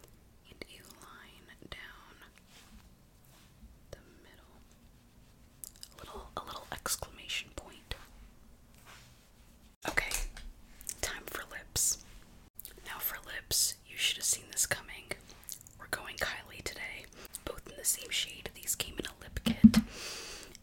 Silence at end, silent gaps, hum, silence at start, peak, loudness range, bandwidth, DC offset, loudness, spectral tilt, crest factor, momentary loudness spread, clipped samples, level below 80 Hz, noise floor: 0.1 s; 9.76-9.81 s, 12.50-12.54 s; none; 0.45 s; -6 dBFS; 22 LU; 17 kHz; under 0.1%; -34 LUFS; -2.5 dB/octave; 30 dB; 22 LU; under 0.1%; -52 dBFS; -60 dBFS